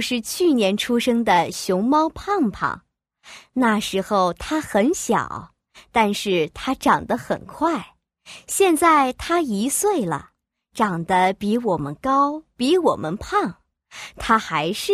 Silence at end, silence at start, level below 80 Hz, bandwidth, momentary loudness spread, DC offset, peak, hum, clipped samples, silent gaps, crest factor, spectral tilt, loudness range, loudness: 0 s; 0 s; -50 dBFS; 15.5 kHz; 9 LU; under 0.1%; -4 dBFS; none; under 0.1%; none; 18 dB; -4 dB/octave; 2 LU; -21 LUFS